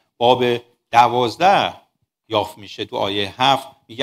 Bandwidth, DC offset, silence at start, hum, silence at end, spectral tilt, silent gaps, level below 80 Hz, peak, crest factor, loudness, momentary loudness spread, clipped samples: 15.5 kHz; under 0.1%; 0.2 s; none; 0 s; -4.5 dB/octave; none; -60 dBFS; 0 dBFS; 18 dB; -18 LUFS; 12 LU; under 0.1%